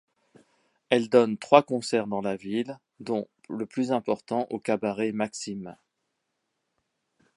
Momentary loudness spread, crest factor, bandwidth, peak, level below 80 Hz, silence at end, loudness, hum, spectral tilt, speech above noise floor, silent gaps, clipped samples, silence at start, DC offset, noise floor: 15 LU; 26 dB; 11.5 kHz; -2 dBFS; -72 dBFS; 1.6 s; -27 LUFS; none; -5 dB/octave; 54 dB; none; under 0.1%; 0.9 s; under 0.1%; -80 dBFS